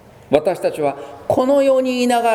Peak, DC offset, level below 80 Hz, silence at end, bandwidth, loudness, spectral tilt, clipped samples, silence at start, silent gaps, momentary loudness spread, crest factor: 0 dBFS; under 0.1%; -54 dBFS; 0 s; 15 kHz; -17 LUFS; -5 dB/octave; under 0.1%; 0.3 s; none; 8 LU; 16 dB